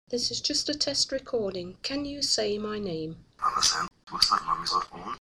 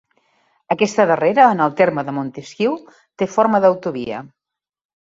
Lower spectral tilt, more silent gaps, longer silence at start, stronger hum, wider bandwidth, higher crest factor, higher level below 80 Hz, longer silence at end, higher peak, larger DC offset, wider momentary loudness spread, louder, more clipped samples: second, -2 dB/octave vs -6 dB/octave; neither; second, 0.1 s vs 0.7 s; neither; first, 15.5 kHz vs 7.8 kHz; first, 24 dB vs 18 dB; first, -56 dBFS vs -62 dBFS; second, 0 s vs 0.75 s; second, -4 dBFS vs 0 dBFS; neither; second, 11 LU vs 14 LU; second, -27 LUFS vs -17 LUFS; neither